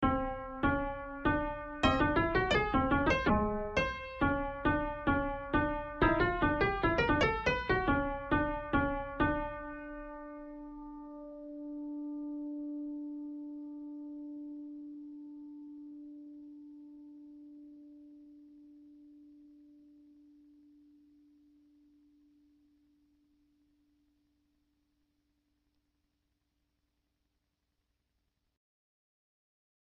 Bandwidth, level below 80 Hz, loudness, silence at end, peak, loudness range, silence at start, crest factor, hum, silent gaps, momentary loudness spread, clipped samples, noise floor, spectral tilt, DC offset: 7.8 kHz; -48 dBFS; -33 LUFS; 10.25 s; -14 dBFS; 20 LU; 0 s; 22 dB; none; none; 21 LU; under 0.1%; -83 dBFS; -6.5 dB/octave; under 0.1%